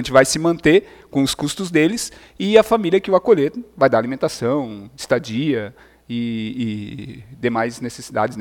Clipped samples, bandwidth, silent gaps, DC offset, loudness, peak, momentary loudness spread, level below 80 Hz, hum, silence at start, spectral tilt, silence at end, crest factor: under 0.1%; 17.5 kHz; none; under 0.1%; -19 LUFS; 0 dBFS; 15 LU; -50 dBFS; none; 0 s; -5 dB/octave; 0 s; 18 dB